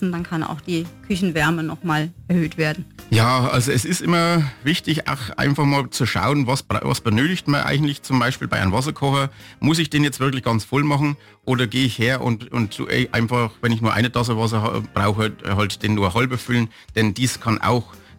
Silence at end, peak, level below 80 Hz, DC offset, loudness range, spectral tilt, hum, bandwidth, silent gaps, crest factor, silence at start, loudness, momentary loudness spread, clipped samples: 0.2 s; -6 dBFS; -48 dBFS; under 0.1%; 1 LU; -5.5 dB/octave; none; 17 kHz; none; 14 dB; 0 s; -20 LUFS; 6 LU; under 0.1%